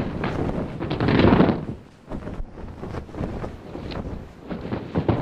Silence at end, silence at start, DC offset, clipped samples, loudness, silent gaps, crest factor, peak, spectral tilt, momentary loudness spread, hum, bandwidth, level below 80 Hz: 0 s; 0 s; under 0.1%; under 0.1%; -24 LUFS; none; 24 dB; -2 dBFS; -8.5 dB/octave; 19 LU; none; 9.2 kHz; -36 dBFS